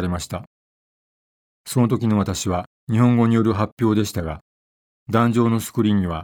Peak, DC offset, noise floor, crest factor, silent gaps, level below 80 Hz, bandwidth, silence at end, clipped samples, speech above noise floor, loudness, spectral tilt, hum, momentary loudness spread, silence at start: -2 dBFS; under 0.1%; under -90 dBFS; 18 dB; 0.47-1.65 s, 2.67-2.87 s, 3.72-3.77 s, 4.41-5.06 s; -46 dBFS; 18.5 kHz; 0 s; under 0.1%; over 71 dB; -20 LUFS; -6.5 dB/octave; none; 13 LU; 0 s